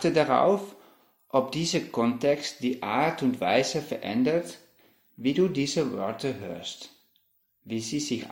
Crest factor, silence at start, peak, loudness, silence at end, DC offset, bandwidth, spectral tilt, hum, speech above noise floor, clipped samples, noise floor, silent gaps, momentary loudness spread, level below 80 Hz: 20 dB; 0 s; -8 dBFS; -27 LUFS; 0 s; under 0.1%; 16.5 kHz; -5 dB/octave; none; 43 dB; under 0.1%; -70 dBFS; none; 13 LU; -64 dBFS